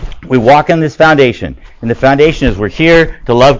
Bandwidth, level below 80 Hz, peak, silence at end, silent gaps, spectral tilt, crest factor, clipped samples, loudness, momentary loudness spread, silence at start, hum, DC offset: 8 kHz; -26 dBFS; 0 dBFS; 0 s; none; -6.5 dB/octave; 8 dB; 2%; -9 LUFS; 11 LU; 0 s; none; under 0.1%